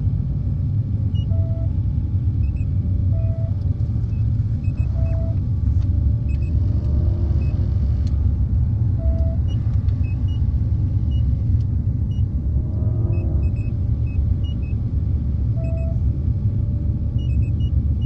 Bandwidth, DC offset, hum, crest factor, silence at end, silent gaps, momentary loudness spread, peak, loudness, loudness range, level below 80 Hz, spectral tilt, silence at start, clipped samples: 3.1 kHz; under 0.1%; none; 12 dB; 0 s; none; 2 LU; -8 dBFS; -21 LUFS; 2 LU; -24 dBFS; -10.5 dB/octave; 0 s; under 0.1%